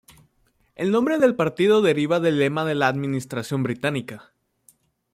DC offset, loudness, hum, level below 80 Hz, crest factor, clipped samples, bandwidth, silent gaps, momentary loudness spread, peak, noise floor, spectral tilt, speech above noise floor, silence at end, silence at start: under 0.1%; -22 LUFS; none; -64 dBFS; 18 dB; under 0.1%; 15.5 kHz; none; 10 LU; -6 dBFS; -65 dBFS; -6.5 dB/octave; 44 dB; 0.9 s; 0.8 s